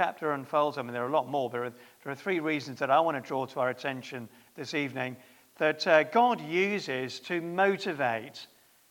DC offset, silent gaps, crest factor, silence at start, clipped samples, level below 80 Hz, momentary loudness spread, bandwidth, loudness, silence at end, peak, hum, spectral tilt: under 0.1%; none; 22 dB; 0 s; under 0.1%; -84 dBFS; 15 LU; 18 kHz; -29 LUFS; 0.45 s; -8 dBFS; none; -5 dB/octave